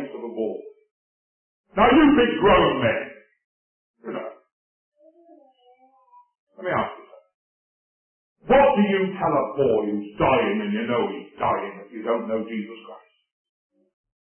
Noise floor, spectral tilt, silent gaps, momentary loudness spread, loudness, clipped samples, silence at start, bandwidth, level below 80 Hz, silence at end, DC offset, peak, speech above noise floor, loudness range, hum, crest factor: -57 dBFS; -10.5 dB/octave; 0.91-1.64 s, 3.44-3.94 s, 4.53-4.92 s, 6.39-6.47 s, 7.34-8.36 s; 17 LU; -21 LUFS; under 0.1%; 0 s; 3.3 kHz; -48 dBFS; 1.25 s; under 0.1%; -6 dBFS; 37 dB; 14 LU; none; 18 dB